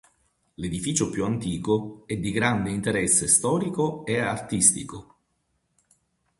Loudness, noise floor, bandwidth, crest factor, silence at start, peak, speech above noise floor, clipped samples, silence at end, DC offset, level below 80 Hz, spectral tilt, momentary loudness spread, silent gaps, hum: -24 LUFS; -73 dBFS; 12 kHz; 24 dB; 0.6 s; -4 dBFS; 48 dB; under 0.1%; 1.35 s; under 0.1%; -52 dBFS; -4 dB/octave; 13 LU; none; none